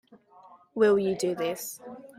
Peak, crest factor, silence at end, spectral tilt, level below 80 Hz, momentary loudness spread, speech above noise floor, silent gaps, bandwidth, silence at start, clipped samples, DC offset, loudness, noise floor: -12 dBFS; 16 dB; 0.05 s; -5 dB/octave; -70 dBFS; 17 LU; 29 dB; none; 16 kHz; 0.75 s; under 0.1%; under 0.1%; -27 LUFS; -55 dBFS